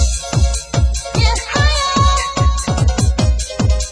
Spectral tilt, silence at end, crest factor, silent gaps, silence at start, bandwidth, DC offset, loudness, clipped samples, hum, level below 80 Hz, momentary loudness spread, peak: -4 dB/octave; 0 s; 14 dB; none; 0 s; 10.5 kHz; under 0.1%; -16 LUFS; under 0.1%; none; -18 dBFS; 4 LU; -2 dBFS